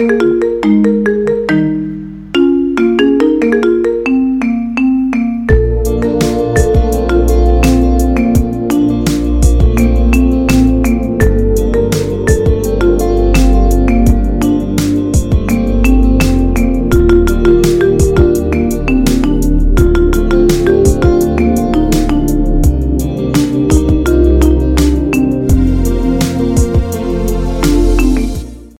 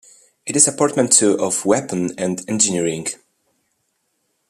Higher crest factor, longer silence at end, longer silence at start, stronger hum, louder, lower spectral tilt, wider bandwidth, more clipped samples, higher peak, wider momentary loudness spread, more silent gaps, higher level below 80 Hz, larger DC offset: second, 10 dB vs 20 dB; second, 0.1 s vs 1.35 s; second, 0 s vs 0.45 s; neither; first, -12 LUFS vs -17 LUFS; first, -7 dB/octave vs -3 dB/octave; first, 16.5 kHz vs 14.5 kHz; first, 0.3% vs under 0.1%; about the same, 0 dBFS vs 0 dBFS; second, 4 LU vs 13 LU; neither; first, -14 dBFS vs -64 dBFS; neither